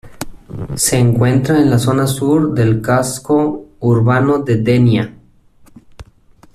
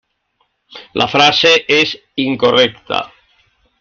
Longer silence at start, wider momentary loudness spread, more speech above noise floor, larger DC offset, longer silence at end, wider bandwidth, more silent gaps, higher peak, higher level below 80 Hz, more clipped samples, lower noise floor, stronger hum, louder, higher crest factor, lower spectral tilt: second, 0.05 s vs 0.75 s; about the same, 14 LU vs 12 LU; second, 34 dB vs 51 dB; neither; second, 0.5 s vs 0.75 s; first, 14 kHz vs 7.2 kHz; neither; about the same, -2 dBFS vs 0 dBFS; first, -42 dBFS vs -54 dBFS; neither; second, -47 dBFS vs -64 dBFS; neither; about the same, -14 LUFS vs -12 LUFS; about the same, 12 dB vs 16 dB; first, -6 dB/octave vs -3.5 dB/octave